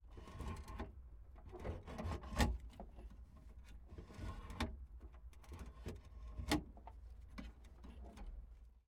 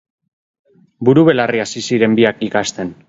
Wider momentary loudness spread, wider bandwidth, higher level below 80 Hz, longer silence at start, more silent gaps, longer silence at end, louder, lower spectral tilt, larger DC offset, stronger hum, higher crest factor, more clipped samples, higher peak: first, 19 LU vs 8 LU; first, 17 kHz vs 8 kHz; about the same, -52 dBFS vs -56 dBFS; second, 0 s vs 1 s; neither; about the same, 0.05 s vs 0.15 s; second, -48 LUFS vs -14 LUFS; about the same, -5 dB/octave vs -5.5 dB/octave; neither; neither; first, 28 dB vs 16 dB; neither; second, -20 dBFS vs 0 dBFS